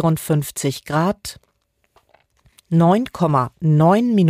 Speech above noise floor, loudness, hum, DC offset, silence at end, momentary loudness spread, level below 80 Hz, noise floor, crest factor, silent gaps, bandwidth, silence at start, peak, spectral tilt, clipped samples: 50 dB; -18 LUFS; none; under 0.1%; 0 s; 9 LU; -52 dBFS; -67 dBFS; 12 dB; none; 16 kHz; 0 s; -6 dBFS; -7 dB/octave; under 0.1%